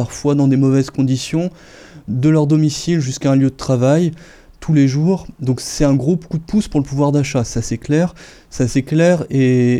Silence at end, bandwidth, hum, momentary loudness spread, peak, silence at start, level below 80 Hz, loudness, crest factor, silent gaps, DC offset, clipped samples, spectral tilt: 0 s; 12.5 kHz; none; 8 LU; 0 dBFS; 0 s; -38 dBFS; -16 LUFS; 16 dB; none; under 0.1%; under 0.1%; -7 dB/octave